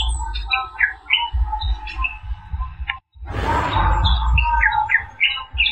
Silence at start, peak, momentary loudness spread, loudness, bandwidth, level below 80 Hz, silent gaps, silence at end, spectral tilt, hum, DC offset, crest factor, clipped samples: 0 s; -2 dBFS; 13 LU; -20 LUFS; 9.4 kHz; -24 dBFS; none; 0 s; -4 dB/octave; none; 0.4%; 18 dB; under 0.1%